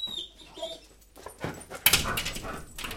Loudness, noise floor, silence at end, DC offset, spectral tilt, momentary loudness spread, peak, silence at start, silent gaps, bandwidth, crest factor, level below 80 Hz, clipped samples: -28 LUFS; -52 dBFS; 0 s; under 0.1%; -1.5 dB/octave; 22 LU; -4 dBFS; 0 s; none; 17 kHz; 30 dB; -46 dBFS; under 0.1%